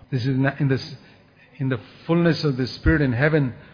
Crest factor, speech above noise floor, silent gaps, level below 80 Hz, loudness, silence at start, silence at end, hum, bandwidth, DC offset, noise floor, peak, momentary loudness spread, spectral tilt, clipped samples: 18 dB; 30 dB; none; -36 dBFS; -22 LUFS; 0.1 s; 0.1 s; none; 5.2 kHz; under 0.1%; -51 dBFS; -4 dBFS; 8 LU; -8 dB/octave; under 0.1%